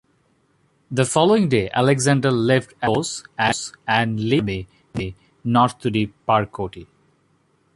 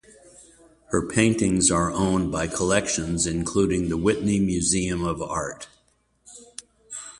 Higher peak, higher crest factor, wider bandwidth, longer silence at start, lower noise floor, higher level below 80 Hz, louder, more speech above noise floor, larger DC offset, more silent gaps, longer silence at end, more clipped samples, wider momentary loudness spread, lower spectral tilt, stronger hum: first, -2 dBFS vs -6 dBFS; about the same, 18 dB vs 18 dB; about the same, 11.5 kHz vs 11.5 kHz; first, 0.9 s vs 0.4 s; about the same, -63 dBFS vs -65 dBFS; second, -50 dBFS vs -44 dBFS; first, -20 LUFS vs -23 LUFS; about the same, 43 dB vs 42 dB; neither; neither; first, 0.9 s vs 0.05 s; neither; second, 13 LU vs 19 LU; about the same, -5 dB/octave vs -4.5 dB/octave; neither